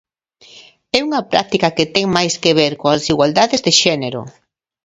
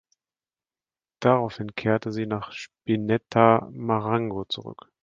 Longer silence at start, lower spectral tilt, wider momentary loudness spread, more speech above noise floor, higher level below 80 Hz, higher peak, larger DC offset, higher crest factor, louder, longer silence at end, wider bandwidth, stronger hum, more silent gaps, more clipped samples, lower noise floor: second, 0.55 s vs 1.2 s; second, -3.5 dB/octave vs -7.5 dB/octave; second, 7 LU vs 13 LU; second, 32 dB vs over 66 dB; first, -50 dBFS vs -60 dBFS; about the same, 0 dBFS vs -2 dBFS; neither; second, 16 dB vs 24 dB; first, -15 LUFS vs -25 LUFS; first, 0.55 s vs 0.3 s; first, 10.5 kHz vs 7.4 kHz; neither; neither; neither; second, -47 dBFS vs under -90 dBFS